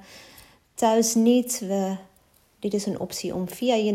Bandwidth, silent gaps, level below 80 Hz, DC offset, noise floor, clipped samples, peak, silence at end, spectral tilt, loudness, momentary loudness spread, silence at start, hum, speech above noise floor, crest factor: 16 kHz; none; -64 dBFS; under 0.1%; -61 dBFS; under 0.1%; -8 dBFS; 0 s; -4.5 dB/octave; -24 LUFS; 14 LU; 0.1 s; none; 37 dB; 16 dB